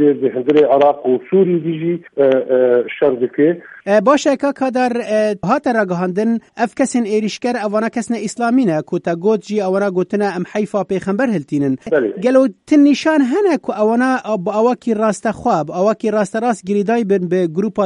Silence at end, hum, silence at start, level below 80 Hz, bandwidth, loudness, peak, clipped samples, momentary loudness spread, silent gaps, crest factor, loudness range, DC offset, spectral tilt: 0 s; none; 0 s; -58 dBFS; 11 kHz; -16 LUFS; 0 dBFS; under 0.1%; 6 LU; none; 14 dB; 3 LU; under 0.1%; -6 dB/octave